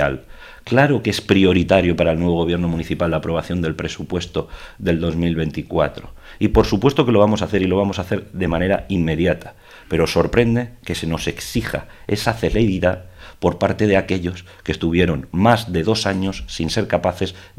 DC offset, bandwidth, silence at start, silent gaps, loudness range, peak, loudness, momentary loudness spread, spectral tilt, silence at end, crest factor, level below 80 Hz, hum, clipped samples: under 0.1%; 15.5 kHz; 0 s; none; 4 LU; 0 dBFS; -19 LUFS; 11 LU; -6 dB/octave; 0.1 s; 18 dB; -36 dBFS; none; under 0.1%